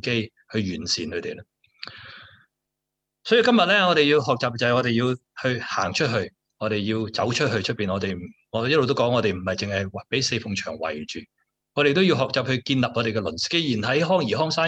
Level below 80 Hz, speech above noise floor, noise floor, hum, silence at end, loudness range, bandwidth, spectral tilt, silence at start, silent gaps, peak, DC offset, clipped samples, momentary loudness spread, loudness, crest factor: -60 dBFS; 60 dB; -83 dBFS; none; 0 s; 4 LU; 8.8 kHz; -5 dB/octave; 0.05 s; none; -6 dBFS; under 0.1%; under 0.1%; 15 LU; -23 LUFS; 18 dB